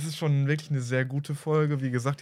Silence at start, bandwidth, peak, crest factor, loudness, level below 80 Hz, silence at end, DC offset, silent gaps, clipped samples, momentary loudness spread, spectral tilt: 0 s; 13 kHz; -12 dBFS; 14 dB; -27 LUFS; -76 dBFS; 0 s; under 0.1%; none; under 0.1%; 4 LU; -6.5 dB/octave